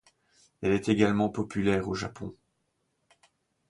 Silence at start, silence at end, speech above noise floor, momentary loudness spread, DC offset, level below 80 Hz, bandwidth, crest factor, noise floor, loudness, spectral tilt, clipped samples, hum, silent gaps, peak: 0.6 s; 1.35 s; 49 dB; 14 LU; under 0.1%; -56 dBFS; 11 kHz; 22 dB; -77 dBFS; -28 LUFS; -6.5 dB/octave; under 0.1%; none; none; -8 dBFS